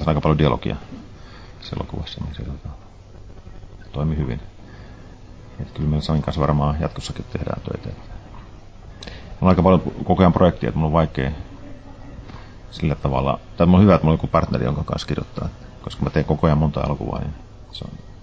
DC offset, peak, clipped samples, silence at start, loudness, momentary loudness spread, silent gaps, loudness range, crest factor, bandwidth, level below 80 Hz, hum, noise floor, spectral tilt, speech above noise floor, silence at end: under 0.1%; -2 dBFS; under 0.1%; 0 s; -20 LUFS; 24 LU; none; 11 LU; 20 dB; 8 kHz; -32 dBFS; none; -40 dBFS; -8.5 dB/octave; 21 dB; 0 s